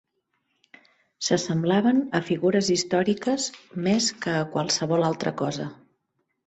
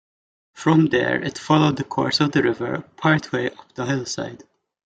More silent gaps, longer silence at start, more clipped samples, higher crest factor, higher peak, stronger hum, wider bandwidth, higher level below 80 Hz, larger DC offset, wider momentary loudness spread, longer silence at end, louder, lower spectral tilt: neither; first, 1.2 s vs 0.55 s; neither; about the same, 18 dB vs 18 dB; second, -8 dBFS vs -2 dBFS; neither; about the same, 8.4 kHz vs 9 kHz; second, -64 dBFS vs -58 dBFS; neither; second, 8 LU vs 11 LU; first, 0.7 s vs 0.5 s; second, -24 LUFS vs -21 LUFS; about the same, -4.5 dB/octave vs -5.5 dB/octave